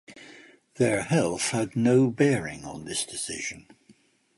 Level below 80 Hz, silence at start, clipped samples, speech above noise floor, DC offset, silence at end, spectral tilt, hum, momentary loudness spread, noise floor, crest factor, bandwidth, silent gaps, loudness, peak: -60 dBFS; 0.1 s; under 0.1%; 35 dB; under 0.1%; 0.75 s; -5 dB/octave; none; 16 LU; -60 dBFS; 18 dB; 11.5 kHz; none; -26 LUFS; -8 dBFS